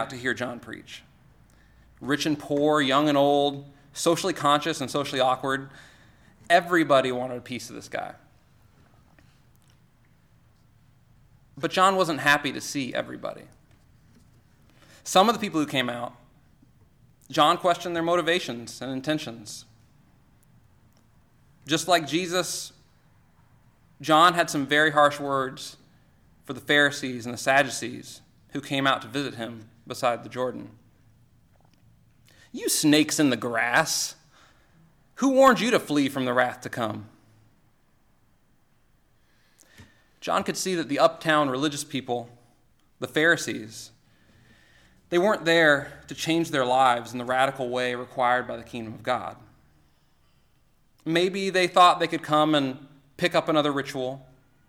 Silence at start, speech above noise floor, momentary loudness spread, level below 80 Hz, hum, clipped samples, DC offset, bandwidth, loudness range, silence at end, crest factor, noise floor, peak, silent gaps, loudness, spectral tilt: 0 s; 38 dB; 18 LU; -64 dBFS; none; under 0.1%; under 0.1%; 17.5 kHz; 8 LU; 0.45 s; 20 dB; -62 dBFS; -6 dBFS; none; -24 LUFS; -3.5 dB/octave